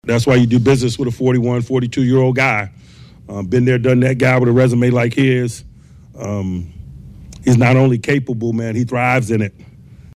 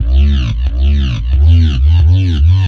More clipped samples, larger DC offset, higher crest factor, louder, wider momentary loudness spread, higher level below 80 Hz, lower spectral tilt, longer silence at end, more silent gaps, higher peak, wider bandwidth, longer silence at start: neither; neither; about the same, 12 dB vs 8 dB; second, -15 LUFS vs -12 LUFS; first, 12 LU vs 5 LU; second, -44 dBFS vs -12 dBFS; about the same, -7 dB/octave vs -7.5 dB/octave; first, 0.65 s vs 0 s; neither; second, -4 dBFS vs 0 dBFS; first, 12 kHz vs 6.2 kHz; about the same, 0.05 s vs 0 s